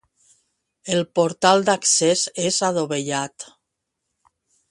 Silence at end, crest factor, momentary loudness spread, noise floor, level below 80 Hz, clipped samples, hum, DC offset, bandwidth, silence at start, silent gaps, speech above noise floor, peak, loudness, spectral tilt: 1.25 s; 22 dB; 16 LU; -79 dBFS; -66 dBFS; under 0.1%; none; under 0.1%; 11.5 kHz; 0.85 s; none; 59 dB; 0 dBFS; -19 LUFS; -3 dB/octave